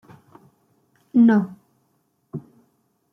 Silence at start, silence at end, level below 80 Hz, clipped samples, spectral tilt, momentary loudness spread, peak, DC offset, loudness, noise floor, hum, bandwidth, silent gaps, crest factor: 1.15 s; 0.75 s; -72 dBFS; under 0.1%; -9.5 dB/octave; 22 LU; -6 dBFS; under 0.1%; -19 LUFS; -68 dBFS; none; 3.6 kHz; none; 18 dB